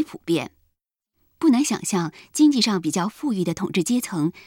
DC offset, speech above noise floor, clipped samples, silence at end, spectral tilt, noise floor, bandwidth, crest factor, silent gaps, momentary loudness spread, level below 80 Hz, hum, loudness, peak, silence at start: under 0.1%; 54 dB; under 0.1%; 0.05 s; -4.5 dB/octave; -76 dBFS; 16.5 kHz; 16 dB; none; 8 LU; -62 dBFS; none; -22 LUFS; -6 dBFS; 0 s